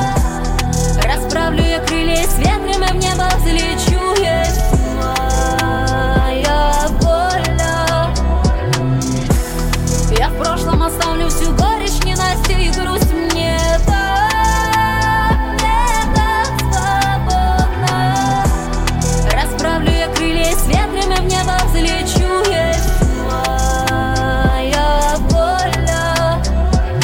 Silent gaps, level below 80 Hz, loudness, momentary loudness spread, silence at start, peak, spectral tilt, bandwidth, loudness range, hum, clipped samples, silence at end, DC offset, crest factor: none; -18 dBFS; -15 LUFS; 2 LU; 0 s; -2 dBFS; -4.5 dB/octave; 17 kHz; 1 LU; none; under 0.1%; 0 s; under 0.1%; 12 dB